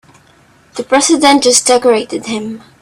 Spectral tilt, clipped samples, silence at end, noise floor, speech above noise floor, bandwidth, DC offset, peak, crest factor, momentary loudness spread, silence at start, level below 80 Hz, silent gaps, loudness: -1.5 dB/octave; under 0.1%; 0.2 s; -47 dBFS; 36 dB; over 20 kHz; under 0.1%; 0 dBFS; 12 dB; 18 LU; 0.75 s; -54 dBFS; none; -11 LUFS